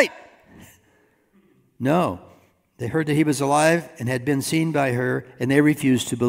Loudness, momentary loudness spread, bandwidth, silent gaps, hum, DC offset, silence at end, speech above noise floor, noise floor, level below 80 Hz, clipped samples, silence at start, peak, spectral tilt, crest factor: -21 LUFS; 8 LU; 16 kHz; none; none; under 0.1%; 0 s; 40 dB; -61 dBFS; -62 dBFS; under 0.1%; 0 s; -2 dBFS; -5.5 dB/octave; 20 dB